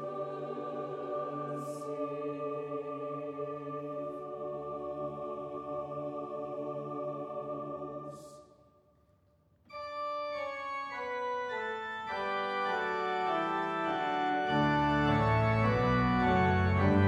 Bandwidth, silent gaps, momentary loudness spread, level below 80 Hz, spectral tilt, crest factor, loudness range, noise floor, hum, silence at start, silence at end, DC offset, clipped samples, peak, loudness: 11.5 kHz; none; 12 LU; -54 dBFS; -7.5 dB/octave; 18 dB; 12 LU; -68 dBFS; none; 0 s; 0 s; under 0.1%; under 0.1%; -14 dBFS; -34 LUFS